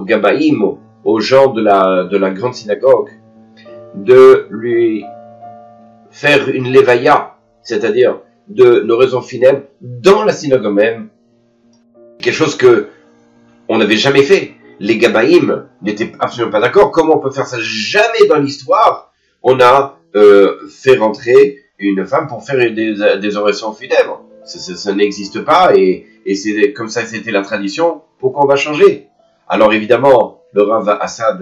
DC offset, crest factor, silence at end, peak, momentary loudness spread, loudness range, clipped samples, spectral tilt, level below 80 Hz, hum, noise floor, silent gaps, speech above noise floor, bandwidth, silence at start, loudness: under 0.1%; 12 dB; 0 s; 0 dBFS; 11 LU; 4 LU; 0.6%; -5 dB/octave; -54 dBFS; none; -53 dBFS; none; 42 dB; 8.6 kHz; 0 s; -12 LUFS